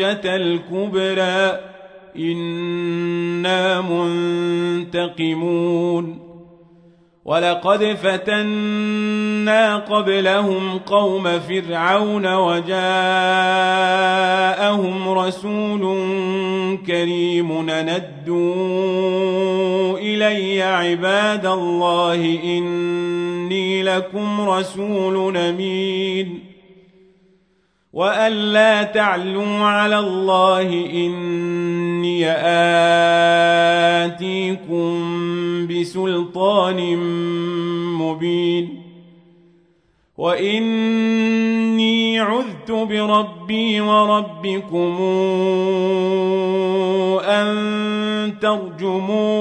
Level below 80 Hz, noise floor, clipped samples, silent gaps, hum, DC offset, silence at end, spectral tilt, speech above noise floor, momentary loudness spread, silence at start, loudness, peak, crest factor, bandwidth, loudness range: -66 dBFS; -62 dBFS; under 0.1%; none; none; under 0.1%; 0 s; -5.5 dB/octave; 44 dB; 7 LU; 0 s; -18 LUFS; -2 dBFS; 16 dB; 10 kHz; 5 LU